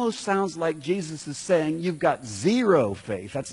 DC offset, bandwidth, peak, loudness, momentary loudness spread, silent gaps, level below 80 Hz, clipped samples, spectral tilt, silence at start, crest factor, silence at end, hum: under 0.1%; 11 kHz; -8 dBFS; -25 LUFS; 11 LU; none; -62 dBFS; under 0.1%; -5.5 dB/octave; 0 s; 16 dB; 0 s; none